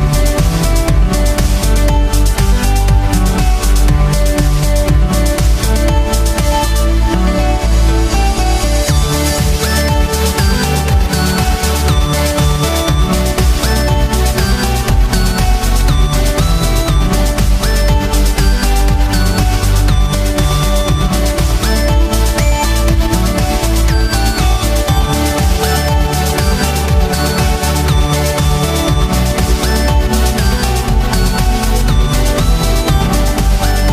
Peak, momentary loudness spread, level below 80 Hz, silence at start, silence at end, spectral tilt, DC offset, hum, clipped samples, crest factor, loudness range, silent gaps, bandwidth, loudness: 0 dBFS; 1 LU; -12 dBFS; 0 s; 0 s; -5 dB/octave; under 0.1%; none; under 0.1%; 10 dB; 0 LU; none; 15.5 kHz; -13 LUFS